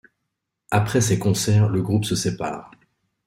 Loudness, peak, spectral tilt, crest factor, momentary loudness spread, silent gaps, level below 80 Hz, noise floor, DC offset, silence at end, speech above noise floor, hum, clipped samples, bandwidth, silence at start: -21 LUFS; -4 dBFS; -5.5 dB/octave; 18 dB; 10 LU; none; -52 dBFS; -79 dBFS; under 0.1%; 0.6 s; 59 dB; none; under 0.1%; 16 kHz; 0.7 s